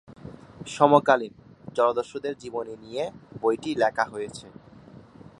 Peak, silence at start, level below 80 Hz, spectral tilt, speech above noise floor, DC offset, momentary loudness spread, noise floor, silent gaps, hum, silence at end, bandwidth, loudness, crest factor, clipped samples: -2 dBFS; 0.25 s; -62 dBFS; -5.5 dB/octave; 24 dB; under 0.1%; 22 LU; -48 dBFS; none; none; 0.9 s; 11 kHz; -25 LUFS; 24 dB; under 0.1%